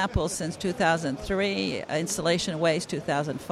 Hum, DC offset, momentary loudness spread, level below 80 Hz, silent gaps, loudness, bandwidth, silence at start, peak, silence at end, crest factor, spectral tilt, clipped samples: none; under 0.1%; 5 LU; -46 dBFS; none; -27 LUFS; 15 kHz; 0 s; -10 dBFS; 0 s; 16 dB; -4.5 dB/octave; under 0.1%